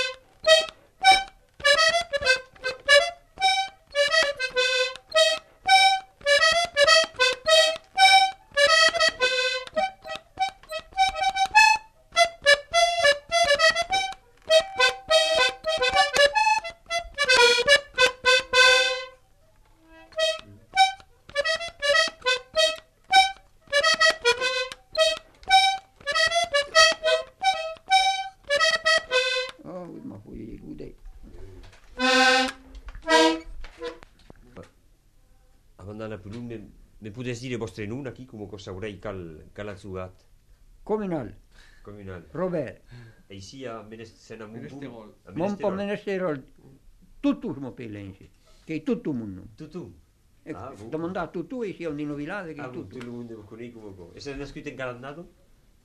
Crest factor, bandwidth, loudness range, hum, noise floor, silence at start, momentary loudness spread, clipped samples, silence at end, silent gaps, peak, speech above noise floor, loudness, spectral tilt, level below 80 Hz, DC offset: 20 dB; 14 kHz; 17 LU; none; -58 dBFS; 0 s; 22 LU; under 0.1%; 0.6 s; none; -4 dBFS; 25 dB; -21 LUFS; -1.5 dB/octave; -52 dBFS; under 0.1%